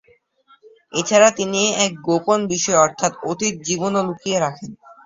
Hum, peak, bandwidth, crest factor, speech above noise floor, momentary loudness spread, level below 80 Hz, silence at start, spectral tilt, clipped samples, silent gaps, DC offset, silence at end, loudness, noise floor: none; 0 dBFS; 8 kHz; 20 dB; 38 dB; 10 LU; -60 dBFS; 0.95 s; -3 dB/octave; under 0.1%; none; under 0.1%; 0.15 s; -18 LUFS; -56 dBFS